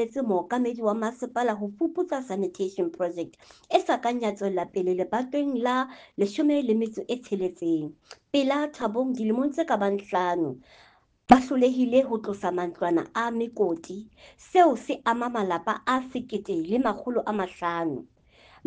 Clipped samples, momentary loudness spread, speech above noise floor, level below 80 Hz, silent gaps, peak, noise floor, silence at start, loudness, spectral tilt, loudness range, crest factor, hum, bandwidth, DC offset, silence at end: under 0.1%; 8 LU; 30 dB; -62 dBFS; none; -4 dBFS; -56 dBFS; 0 s; -26 LUFS; -6 dB/octave; 4 LU; 24 dB; none; 9.4 kHz; under 0.1%; 0.6 s